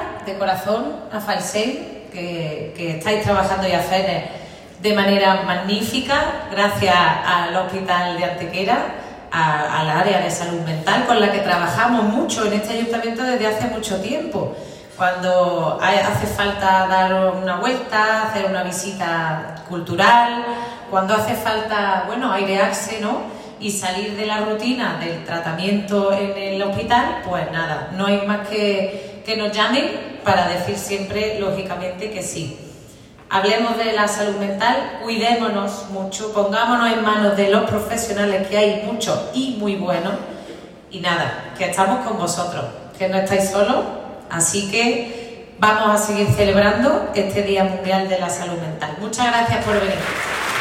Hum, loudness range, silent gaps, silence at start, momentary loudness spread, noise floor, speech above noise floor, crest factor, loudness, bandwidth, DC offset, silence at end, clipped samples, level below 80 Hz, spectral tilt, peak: none; 4 LU; none; 0 s; 10 LU; -42 dBFS; 23 dB; 18 dB; -19 LUFS; 16.5 kHz; under 0.1%; 0 s; under 0.1%; -48 dBFS; -4 dB/octave; -2 dBFS